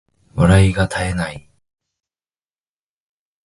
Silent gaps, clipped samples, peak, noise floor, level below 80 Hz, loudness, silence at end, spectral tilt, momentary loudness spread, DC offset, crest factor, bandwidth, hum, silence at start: none; under 0.1%; 0 dBFS; under -90 dBFS; -32 dBFS; -16 LUFS; 2.05 s; -6.5 dB/octave; 14 LU; under 0.1%; 20 dB; 11.5 kHz; none; 0.35 s